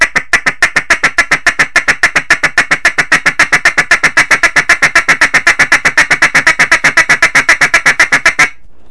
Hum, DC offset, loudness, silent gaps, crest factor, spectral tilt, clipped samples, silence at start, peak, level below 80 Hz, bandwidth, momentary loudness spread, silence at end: none; 4%; -7 LUFS; none; 10 dB; -1 dB/octave; 3%; 0 s; 0 dBFS; -34 dBFS; 11 kHz; 3 LU; 0.4 s